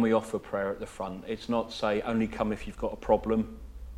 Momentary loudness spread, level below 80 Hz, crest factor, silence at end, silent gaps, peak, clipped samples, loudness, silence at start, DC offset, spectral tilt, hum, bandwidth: 11 LU; -46 dBFS; 20 dB; 0 s; none; -10 dBFS; under 0.1%; -31 LUFS; 0 s; under 0.1%; -6.5 dB/octave; none; 12.5 kHz